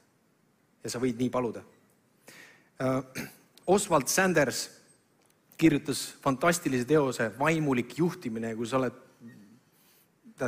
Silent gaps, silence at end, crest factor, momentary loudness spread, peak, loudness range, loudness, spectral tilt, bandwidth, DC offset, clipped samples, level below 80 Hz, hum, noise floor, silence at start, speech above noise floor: none; 0 s; 20 dB; 13 LU; -10 dBFS; 6 LU; -28 LUFS; -4.5 dB/octave; 16 kHz; under 0.1%; under 0.1%; -62 dBFS; none; -68 dBFS; 0.85 s; 40 dB